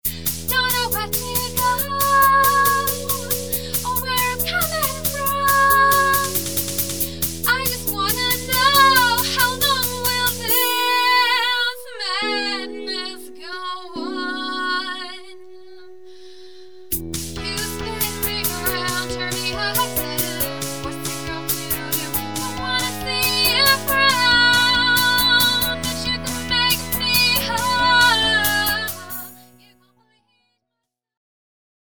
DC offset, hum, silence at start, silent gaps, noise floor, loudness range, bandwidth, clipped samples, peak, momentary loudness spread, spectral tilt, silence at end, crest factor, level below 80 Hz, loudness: 1%; none; 0 s; none; -80 dBFS; 11 LU; over 20 kHz; under 0.1%; 0 dBFS; 13 LU; -1.5 dB/octave; 0.7 s; 20 dB; -44 dBFS; -18 LUFS